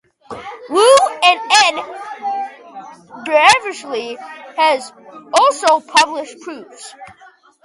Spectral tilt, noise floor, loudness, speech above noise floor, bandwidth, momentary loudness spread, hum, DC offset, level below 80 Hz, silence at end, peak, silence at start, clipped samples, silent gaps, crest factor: -0.5 dB/octave; -47 dBFS; -14 LUFS; 29 dB; 12.5 kHz; 23 LU; none; under 0.1%; -62 dBFS; 0.6 s; 0 dBFS; 0.3 s; under 0.1%; none; 16 dB